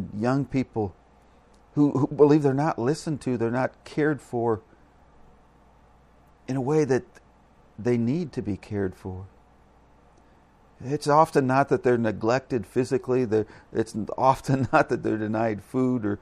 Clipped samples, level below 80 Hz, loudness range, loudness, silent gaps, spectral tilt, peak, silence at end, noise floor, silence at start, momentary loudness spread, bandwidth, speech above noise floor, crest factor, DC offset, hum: under 0.1%; -56 dBFS; 7 LU; -25 LUFS; none; -7.5 dB/octave; -6 dBFS; 0.05 s; -57 dBFS; 0 s; 11 LU; 13 kHz; 32 dB; 20 dB; under 0.1%; none